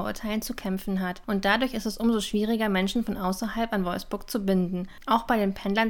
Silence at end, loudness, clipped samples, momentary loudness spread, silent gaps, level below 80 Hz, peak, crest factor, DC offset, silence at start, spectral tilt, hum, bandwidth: 0 s; -27 LUFS; under 0.1%; 7 LU; none; -46 dBFS; -8 dBFS; 18 dB; under 0.1%; 0 s; -5.5 dB/octave; none; 19 kHz